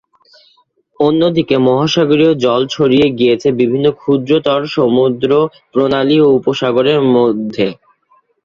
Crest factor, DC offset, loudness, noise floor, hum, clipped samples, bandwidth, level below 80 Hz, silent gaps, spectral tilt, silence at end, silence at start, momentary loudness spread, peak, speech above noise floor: 12 dB; under 0.1%; -12 LUFS; -55 dBFS; none; under 0.1%; 7.4 kHz; -52 dBFS; none; -6.5 dB/octave; 0.7 s; 1 s; 5 LU; 0 dBFS; 43 dB